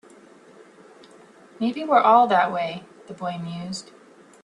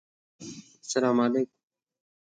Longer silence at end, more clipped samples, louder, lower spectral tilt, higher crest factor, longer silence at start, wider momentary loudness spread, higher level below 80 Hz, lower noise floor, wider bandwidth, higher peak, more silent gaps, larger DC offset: second, 0.6 s vs 0.85 s; neither; first, -22 LUFS vs -27 LUFS; about the same, -5.5 dB/octave vs -4.5 dB/octave; about the same, 20 dB vs 18 dB; first, 1.6 s vs 0.4 s; about the same, 19 LU vs 20 LU; first, -72 dBFS vs -78 dBFS; first, -50 dBFS vs -45 dBFS; first, 10.5 kHz vs 9.2 kHz; first, -4 dBFS vs -12 dBFS; neither; neither